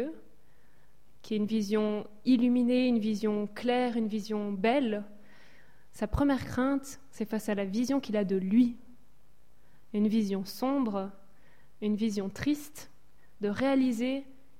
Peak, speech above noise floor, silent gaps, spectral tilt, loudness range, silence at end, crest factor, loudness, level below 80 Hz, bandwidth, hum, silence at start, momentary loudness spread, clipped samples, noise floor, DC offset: -14 dBFS; 37 dB; none; -6 dB/octave; 4 LU; 0.35 s; 16 dB; -30 LUFS; -54 dBFS; 16 kHz; none; 0 s; 11 LU; under 0.1%; -66 dBFS; 0.5%